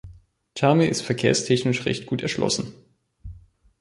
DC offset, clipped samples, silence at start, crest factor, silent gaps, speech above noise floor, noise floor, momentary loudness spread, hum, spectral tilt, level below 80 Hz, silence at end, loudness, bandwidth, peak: under 0.1%; under 0.1%; 0.05 s; 20 dB; none; 27 dB; -49 dBFS; 21 LU; none; -5 dB/octave; -52 dBFS; 0.4 s; -22 LUFS; 11.5 kHz; -4 dBFS